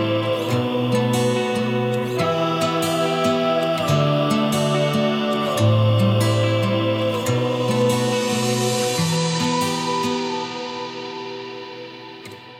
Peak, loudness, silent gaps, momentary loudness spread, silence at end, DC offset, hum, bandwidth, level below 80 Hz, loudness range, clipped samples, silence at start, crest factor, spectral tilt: -6 dBFS; -20 LUFS; none; 12 LU; 0 s; under 0.1%; none; 16.5 kHz; -62 dBFS; 4 LU; under 0.1%; 0 s; 14 dB; -5.5 dB/octave